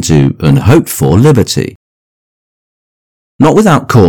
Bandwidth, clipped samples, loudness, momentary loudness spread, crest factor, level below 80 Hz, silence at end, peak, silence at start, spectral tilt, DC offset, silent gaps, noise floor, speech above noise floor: 18.5 kHz; 5%; -8 LUFS; 6 LU; 10 dB; -32 dBFS; 0 s; 0 dBFS; 0 s; -6.5 dB/octave; under 0.1%; 1.76-3.39 s; under -90 dBFS; over 83 dB